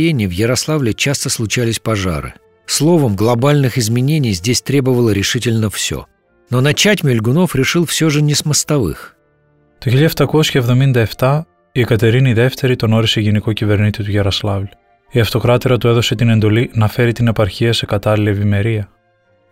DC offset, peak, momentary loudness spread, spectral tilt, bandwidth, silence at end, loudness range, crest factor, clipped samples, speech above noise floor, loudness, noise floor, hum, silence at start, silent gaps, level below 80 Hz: under 0.1%; -2 dBFS; 7 LU; -5 dB/octave; 16.5 kHz; 0.65 s; 2 LU; 12 dB; under 0.1%; 43 dB; -14 LUFS; -56 dBFS; none; 0 s; none; -40 dBFS